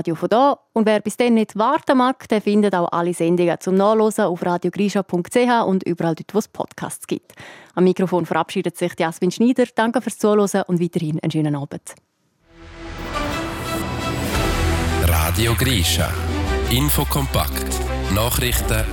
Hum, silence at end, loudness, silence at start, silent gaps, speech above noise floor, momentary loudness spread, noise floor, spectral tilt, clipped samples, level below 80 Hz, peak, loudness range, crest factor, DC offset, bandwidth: none; 0 s; -19 LUFS; 0 s; none; 37 dB; 10 LU; -56 dBFS; -5 dB/octave; under 0.1%; -32 dBFS; -4 dBFS; 6 LU; 16 dB; under 0.1%; 18 kHz